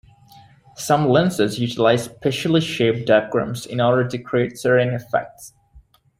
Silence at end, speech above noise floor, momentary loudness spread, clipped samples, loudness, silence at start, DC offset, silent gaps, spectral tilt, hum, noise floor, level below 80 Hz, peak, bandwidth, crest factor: 0.4 s; 32 dB; 7 LU; under 0.1%; -19 LUFS; 0.8 s; under 0.1%; none; -5.5 dB/octave; none; -51 dBFS; -54 dBFS; -2 dBFS; 16 kHz; 18 dB